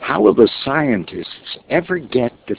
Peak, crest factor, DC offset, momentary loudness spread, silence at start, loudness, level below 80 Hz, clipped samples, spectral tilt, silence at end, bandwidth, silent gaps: 0 dBFS; 18 dB; under 0.1%; 16 LU; 0 s; -16 LUFS; -50 dBFS; under 0.1%; -10 dB/octave; 0 s; 4 kHz; none